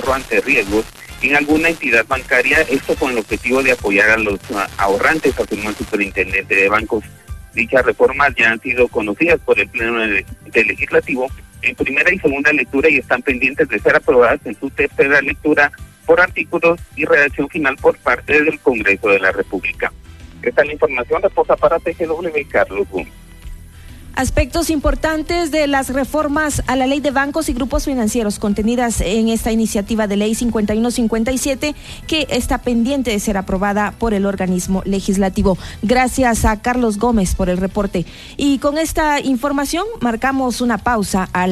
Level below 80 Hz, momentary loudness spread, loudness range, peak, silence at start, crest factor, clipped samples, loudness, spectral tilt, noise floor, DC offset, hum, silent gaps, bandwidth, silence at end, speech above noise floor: -32 dBFS; 7 LU; 4 LU; -2 dBFS; 0 s; 14 dB; under 0.1%; -16 LUFS; -4.5 dB/octave; -36 dBFS; 0.1%; none; none; 13.5 kHz; 0 s; 20 dB